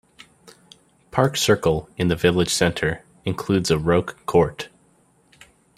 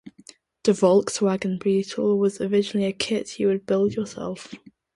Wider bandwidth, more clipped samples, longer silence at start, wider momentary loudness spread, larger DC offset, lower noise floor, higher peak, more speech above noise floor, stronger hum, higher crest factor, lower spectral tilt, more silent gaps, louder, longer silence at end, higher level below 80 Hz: first, 15.5 kHz vs 11.5 kHz; neither; first, 1.15 s vs 0.05 s; about the same, 10 LU vs 12 LU; neither; first, -59 dBFS vs -51 dBFS; first, -2 dBFS vs -6 dBFS; first, 39 dB vs 29 dB; neither; about the same, 20 dB vs 18 dB; about the same, -5 dB/octave vs -5.5 dB/octave; neither; about the same, -21 LUFS vs -23 LUFS; first, 1.1 s vs 0.4 s; first, -46 dBFS vs -62 dBFS